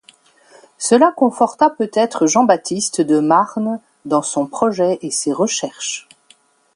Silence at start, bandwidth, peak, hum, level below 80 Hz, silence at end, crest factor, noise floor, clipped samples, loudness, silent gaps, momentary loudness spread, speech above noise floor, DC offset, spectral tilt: 0.8 s; 11.5 kHz; 0 dBFS; none; -66 dBFS; 0.75 s; 16 dB; -53 dBFS; under 0.1%; -16 LUFS; none; 10 LU; 37 dB; under 0.1%; -4 dB/octave